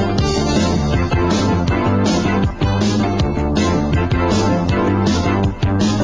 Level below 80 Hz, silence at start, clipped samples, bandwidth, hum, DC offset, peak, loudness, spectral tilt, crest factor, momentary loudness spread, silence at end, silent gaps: -26 dBFS; 0 s; under 0.1%; 9.8 kHz; none; under 0.1%; -4 dBFS; -17 LUFS; -6 dB/octave; 12 dB; 2 LU; 0 s; none